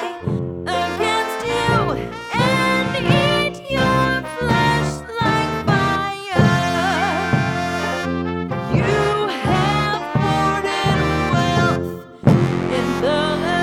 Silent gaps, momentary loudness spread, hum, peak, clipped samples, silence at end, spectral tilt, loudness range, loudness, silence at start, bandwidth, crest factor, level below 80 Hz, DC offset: none; 7 LU; none; -2 dBFS; under 0.1%; 0 s; -5.5 dB/octave; 1 LU; -19 LUFS; 0 s; 16 kHz; 18 dB; -38 dBFS; under 0.1%